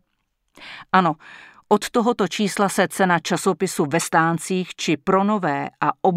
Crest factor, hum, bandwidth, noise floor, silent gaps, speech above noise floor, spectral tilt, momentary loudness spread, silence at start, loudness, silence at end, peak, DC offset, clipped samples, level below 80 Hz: 18 dB; none; 16 kHz; -72 dBFS; none; 52 dB; -4.5 dB/octave; 5 LU; 0.6 s; -21 LUFS; 0 s; -2 dBFS; under 0.1%; under 0.1%; -62 dBFS